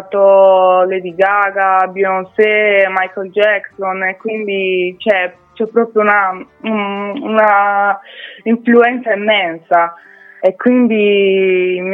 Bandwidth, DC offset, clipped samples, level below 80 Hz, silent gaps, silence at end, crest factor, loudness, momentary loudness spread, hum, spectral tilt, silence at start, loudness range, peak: 4.1 kHz; under 0.1%; under 0.1%; -66 dBFS; none; 0 s; 12 dB; -13 LUFS; 9 LU; none; -7.5 dB/octave; 0 s; 3 LU; 0 dBFS